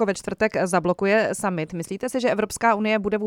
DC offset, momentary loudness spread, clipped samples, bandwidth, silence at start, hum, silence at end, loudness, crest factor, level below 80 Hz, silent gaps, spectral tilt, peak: under 0.1%; 7 LU; under 0.1%; 16.5 kHz; 0 s; none; 0 s; -23 LUFS; 16 dB; -54 dBFS; none; -5 dB/octave; -6 dBFS